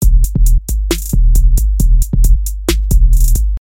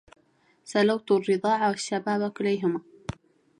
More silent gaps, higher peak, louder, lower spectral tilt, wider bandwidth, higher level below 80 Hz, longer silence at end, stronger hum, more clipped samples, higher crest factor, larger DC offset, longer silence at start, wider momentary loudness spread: neither; first, 0 dBFS vs -10 dBFS; first, -14 LUFS vs -26 LUFS; about the same, -5.5 dB/octave vs -5 dB/octave; first, 16.5 kHz vs 11 kHz; first, -10 dBFS vs -60 dBFS; second, 0 s vs 0.8 s; neither; neither; second, 8 dB vs 16 dB; neither; second, 0 s vs 0.65 s; second, 4 LU vs 13 LU